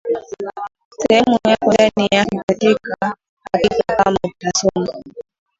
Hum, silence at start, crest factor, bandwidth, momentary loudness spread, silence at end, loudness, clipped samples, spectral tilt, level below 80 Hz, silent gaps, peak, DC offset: none; 0.05 s; 18 dB; 8 kHz; 15 LU; 0.4 s; -17 LUFS; under 0.1%; -4 dB/octave; -48 dBFS; 0.85-0.91 s, 2.43-2.48 s, 3.29-3.37 s; 0 dBFS; under 0.1%